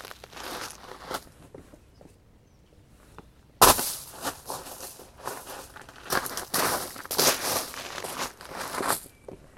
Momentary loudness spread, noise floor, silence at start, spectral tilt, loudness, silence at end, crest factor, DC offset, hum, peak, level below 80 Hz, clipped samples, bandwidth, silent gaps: 21 LU; -57 dBFS; 0 s; -1.5 dB/octave; -27 LUFS; 0.1 s; 30 dB; under 0.1%; none; -2 dBFS; -52 dBFS; under 0.1%; 16.5 kHz; none